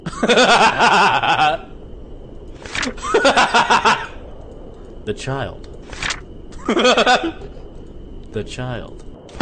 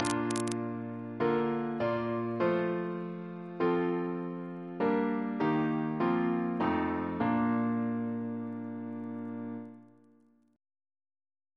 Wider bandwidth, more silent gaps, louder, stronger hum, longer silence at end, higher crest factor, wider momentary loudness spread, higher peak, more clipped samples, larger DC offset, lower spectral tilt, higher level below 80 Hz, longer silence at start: second, 9.4 kHz vs 11 kHz; neither; first, -16 LUFS vs -32 LUFS; neither; second, 0 s vs 1.7 s; second, 14 dB vs 22 dB; first, 24 LU vs 10 LU; first, -4 dBFS vs -12 dBFS; neither; first, 0.3% vs under 0.1%; second, -3 dB/octave vs -6.5 dB/octave; first, -38 dBFS vs -68 dBFS; about the same, 0 s vs 0 s